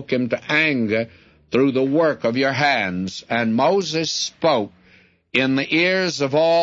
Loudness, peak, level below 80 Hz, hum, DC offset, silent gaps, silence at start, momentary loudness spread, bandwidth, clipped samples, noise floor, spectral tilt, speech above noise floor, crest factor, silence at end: -19 LUFS; -4 dBFS; -62 dBFS; none; under 0.1%; none; 0 s; 7 LU; 7.8 kHz; under 0.1%; -54 dBFS; -4.5 dB/octave; 34 dB; 16 dB; 0 s